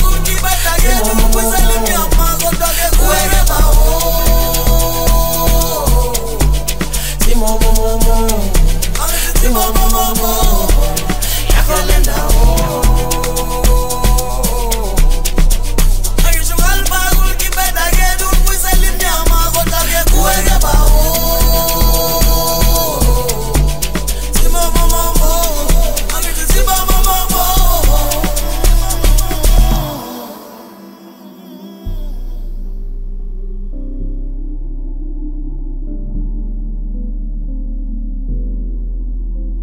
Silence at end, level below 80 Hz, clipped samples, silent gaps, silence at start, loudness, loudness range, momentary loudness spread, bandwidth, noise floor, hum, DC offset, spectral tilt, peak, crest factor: 0 s; -12 dBFS; under 0.1%; none; 0 s; -14 LUFS; 14 LU; 15 LU; 16.5 kHz; -35 dBFS; none; 10%; -3.5 dB/octave; 0 dBFS; 12 dB